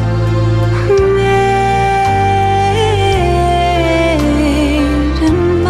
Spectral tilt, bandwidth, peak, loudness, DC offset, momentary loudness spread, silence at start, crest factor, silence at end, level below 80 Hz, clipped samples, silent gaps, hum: -6.5 dB/octave; 13.5 kHz; -2 dBFS; -12 LUFS; under 0.1%; 2 LU; 0 s; 10 dB; 0 s; -22 dBFS; under 0.1%; none; none